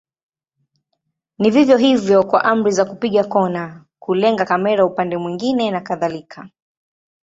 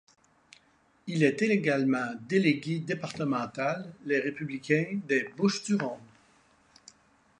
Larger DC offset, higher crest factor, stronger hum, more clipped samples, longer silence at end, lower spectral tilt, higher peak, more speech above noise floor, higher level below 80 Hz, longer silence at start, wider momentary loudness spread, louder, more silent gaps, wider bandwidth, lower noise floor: neither; about the same, 16 dB vs 20 dB; neither; neither; second, 0.9 s vs 1.35 s; about the same, -5.5 dB/octave vs -6 dB/octave; first, -2 dBFS vs -10 dBFS; first, 58 dB vs 37 dB; first, -60 dBFS vs -74 dBFS; first, 1.4 s vs 1.05 s; about the same, 10 LU vs 9 LU; first, -17 LUFS vs -29 LUFS; neither; second, 8 kHz vs 10.5 kHz; first, -74 dBFS vs -66 dBFS